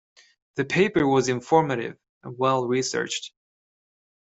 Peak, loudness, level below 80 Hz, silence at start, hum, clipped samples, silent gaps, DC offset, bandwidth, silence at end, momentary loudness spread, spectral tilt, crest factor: -6 dBFS; -23 LUFS; -62 dBFS; 0.55 s; none; under 0.1%; 2.09-2.21 s; under 0.1%; 8.2 kHz; 1.05 s; 15 LU; -5 dB/octave; 20 dB